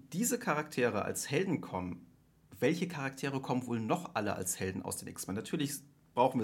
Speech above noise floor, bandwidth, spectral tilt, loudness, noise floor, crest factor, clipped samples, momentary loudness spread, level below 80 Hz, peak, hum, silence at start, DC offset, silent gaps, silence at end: 25 dB; 17 kHz; -4.5 dB/octave; -35 LUFS; -60 dBFS; 20 dB; under 0.1%; 8 LU; -72 dBFS; -14 dBFS; none; 0.05 s; under 0.1%; none; 0 s